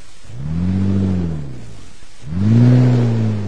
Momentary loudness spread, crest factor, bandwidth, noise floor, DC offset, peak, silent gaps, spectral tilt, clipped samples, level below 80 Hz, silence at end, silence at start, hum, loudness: 18 LU; 16 dB; 8.4 kHz; -39 dBFS; 5%; -2 dBFS; none; -9 dB/octave; under 0.1%; -38 dBFS; 0 s; 0.3 s; none; -16 LUFS